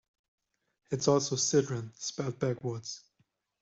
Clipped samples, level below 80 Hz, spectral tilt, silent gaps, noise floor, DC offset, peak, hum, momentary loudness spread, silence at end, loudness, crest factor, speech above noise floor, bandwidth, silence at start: under 0.1%; -70 dBFS; -4.5 dB/octave; none; -75 dBFS; under 0.1%; -12 dBFS; none; 12 LU; 0.65 s; -31 LUFS; 20 dB; 44 dB; 8.2 kHz; 0.9 s